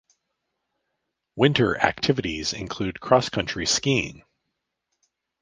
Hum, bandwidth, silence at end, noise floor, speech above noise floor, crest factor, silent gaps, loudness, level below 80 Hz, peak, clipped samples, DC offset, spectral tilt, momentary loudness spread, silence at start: none; 10 kHz; 1.3 s; -80 dBFS; 57 dB; 24 dB; none; -23 LUFS; -50 dBFS; -2 dBFS; under 0.1%; under 0.1%; -4 dB/octave; 10 LU; 1.35 s